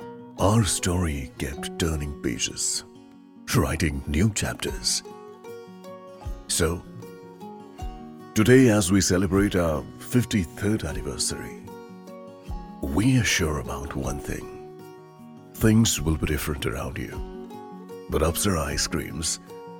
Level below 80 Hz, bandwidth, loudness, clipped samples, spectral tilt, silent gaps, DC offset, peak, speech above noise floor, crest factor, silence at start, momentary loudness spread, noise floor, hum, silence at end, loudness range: -40 dBFS; 17.5 kHz; -24 LUFS; under 0.1%; -4.5 dB/octave; none; under 0.1%; -4 dBFS; 24 dB; 22 dB; 0 s; 21 LU; -48 dBFS; none; 0 s; 6 LU